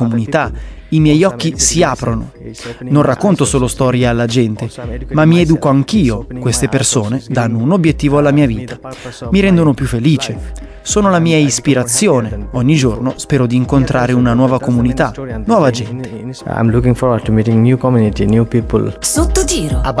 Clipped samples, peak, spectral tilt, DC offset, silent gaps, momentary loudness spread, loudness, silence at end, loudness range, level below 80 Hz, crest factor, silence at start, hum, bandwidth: under 0.1%; 0 dBFS; -5.5 dB/octave; under 0.1%; none; 12 LU; -13 LUFS; 0 s; 1 LU; -28 dBFS; 12 dB; 0 s; none; 11 kHz